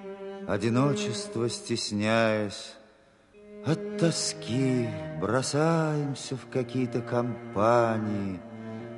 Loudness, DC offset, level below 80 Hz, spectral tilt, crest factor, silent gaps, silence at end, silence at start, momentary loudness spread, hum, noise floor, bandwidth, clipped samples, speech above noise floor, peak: -28 LUFS; under 0.1%; -60 dBFS; -5.5 dB/octave; 18 dB; none; 0 s; 0 s; 12 LU; none; -59 dBFS; 11.5 kHz; under 0.1%; 31 dB; -10 dBFS